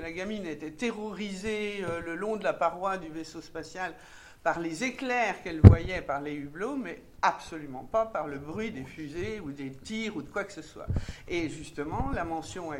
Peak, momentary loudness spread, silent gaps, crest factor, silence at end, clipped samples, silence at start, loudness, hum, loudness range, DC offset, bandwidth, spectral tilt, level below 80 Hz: 0 dBFS; 12 LU; none; 28 dB; 0 s; under 0.1%; 0 s; -30 LUFS; none; 10 LU; under 0.1%; 10.5 kHz; -7 dB/octave; -40 dBFS